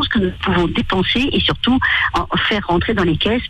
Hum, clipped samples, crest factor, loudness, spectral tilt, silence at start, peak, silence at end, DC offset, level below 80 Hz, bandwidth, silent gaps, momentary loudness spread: none; under 0.1%; 10 dB; -16 LUFS; -6 dB/octave; 0 s; -6 dBFS; 0 s; under 0.1%; -32 dBFS; 11 kHz; none; 3 LU